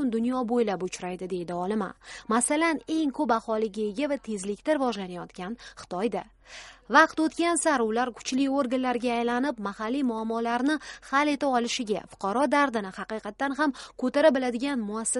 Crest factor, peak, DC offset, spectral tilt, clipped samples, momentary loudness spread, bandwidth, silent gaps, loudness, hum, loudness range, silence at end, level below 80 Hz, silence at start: 22 dB; -6 dBFS; under 0.1%; -3.5 dB/octave; under 0.1%; 12 LU; 11.5 kHz; none; -27 LUFS; none; 4 LU; 0 s; -62 dBFS; 0 s